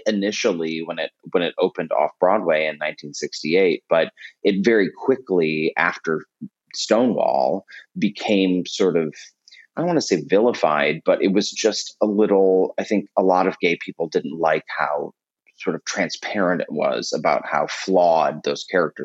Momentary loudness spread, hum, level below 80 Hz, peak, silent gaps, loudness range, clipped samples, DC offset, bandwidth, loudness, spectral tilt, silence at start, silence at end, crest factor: 10 LU; none; -72 dBFS; -2 dBFS; none; 4 LU; under 0.1%; under 0.1%; 8.2 kHz; -21 LUFS; -4.5 dB/octave; 0.05 s; 0 s; 18 dB